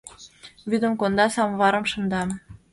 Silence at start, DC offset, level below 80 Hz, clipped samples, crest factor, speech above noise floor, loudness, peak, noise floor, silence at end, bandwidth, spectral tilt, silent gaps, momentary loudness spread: 0.05 s; under 0.1%; -54 dBFS; under 0.1%; 18 dB; 25 dB; -23 LUFS; -6 dBFS; -47 dBFS; 0.15 s; 11.5 kHz; -5 dB/octave; none; 17 LU